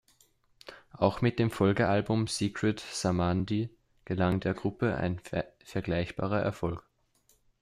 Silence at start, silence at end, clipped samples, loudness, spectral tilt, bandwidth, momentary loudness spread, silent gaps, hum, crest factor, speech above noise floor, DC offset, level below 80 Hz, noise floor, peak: 0.65 s; 0.8 s; under 0.1%; -30 LUFS; -6 dB/octave; 14.5 kHz; 10 LU; none; none; 22 dB; 39 dB; under 0.1%; -56 dBFS; -69 dBFS; -10 dBFS